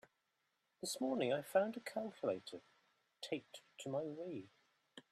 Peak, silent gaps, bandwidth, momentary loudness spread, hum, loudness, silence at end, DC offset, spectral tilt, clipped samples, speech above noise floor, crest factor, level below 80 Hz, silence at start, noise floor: -22 dBFS; none; 14 kHz; 18 LU; none; -42 LUFS; 0.1 s; under 0.1%; -4 dB/octave; under 0.1%; 43 dB; 22 dB; -90 dBFS; 0.8 s; -85 dBFS